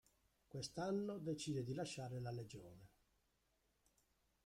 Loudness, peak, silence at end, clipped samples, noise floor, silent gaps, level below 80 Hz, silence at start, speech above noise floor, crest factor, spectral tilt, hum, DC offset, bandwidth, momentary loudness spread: -47 LUFS; -34 dBFS; 1.6 s; under 0.1%; -83 dBFS; none; -76 dBFS; 0.5 s; 36 dB; 16 dB; -5.5 dB/octave; none; under 0.1%; 16 kHz; 14 LU